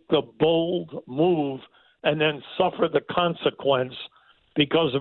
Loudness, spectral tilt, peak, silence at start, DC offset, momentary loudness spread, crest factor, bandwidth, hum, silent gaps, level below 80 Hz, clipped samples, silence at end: -24 LUFS; -9.5 dB/octave; -8 dBFS; 0.1 s; under 0.1%; 11 LU; 16 dB; 4.3 kHz; none; none; -62 dBFS; under 0.1%; 0 s